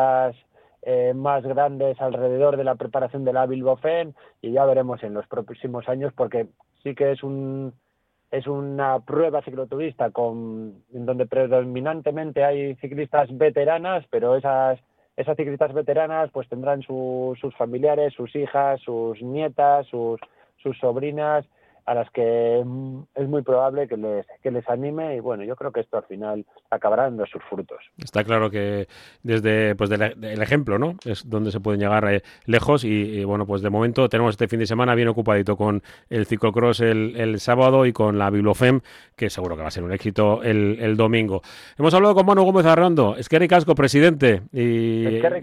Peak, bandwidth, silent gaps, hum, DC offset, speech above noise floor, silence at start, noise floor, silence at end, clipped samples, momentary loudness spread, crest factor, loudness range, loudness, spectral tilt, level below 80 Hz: -4 dBFS; 13.5 kHz; none; none; under 0.1%; 35 dB; 0 s; -56 dBFS; 0 s; under 0.1%; 13 LU; 18 dB; 8 LU; -22 LUFS; -7 dB/octave; -54 dBFS